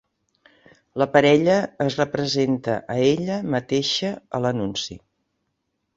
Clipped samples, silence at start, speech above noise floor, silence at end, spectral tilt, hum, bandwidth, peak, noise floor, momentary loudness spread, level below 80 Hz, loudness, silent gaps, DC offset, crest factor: under 0.1%; 0.95 s; 54 dB; 1 s; -5 dB/octave; none; 7.8 kHz; -4 dBFS; -75 dBFS; 10 LU; -58 dBFS; -22 LUFS; none; under 0.1%; 20 dB